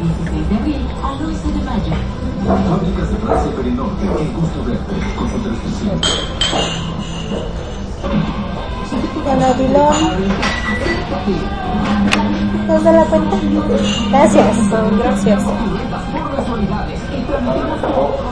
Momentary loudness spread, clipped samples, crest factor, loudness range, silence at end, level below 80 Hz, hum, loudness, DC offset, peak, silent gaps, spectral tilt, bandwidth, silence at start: 10 LU; under 0.1%; 16 dB; 6 LU; 0 s; -26 dBFS; none; -16 LUFS; 1%; 0 dBFS; none; -5.5 dB/octave; 11 kHz; 0 s